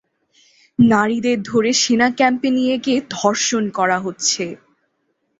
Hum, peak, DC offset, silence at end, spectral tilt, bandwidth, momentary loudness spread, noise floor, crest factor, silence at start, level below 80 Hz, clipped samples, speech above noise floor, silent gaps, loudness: none; -2 dBFS; under 0.1%; 0.85 s; -3.5 dB/octave; 8 kHz; 5 LU; -69 dBFS; 16 dB; 0.8 s; -60 dBFS; under 0.1%; 52 dB; none; -17 LUFS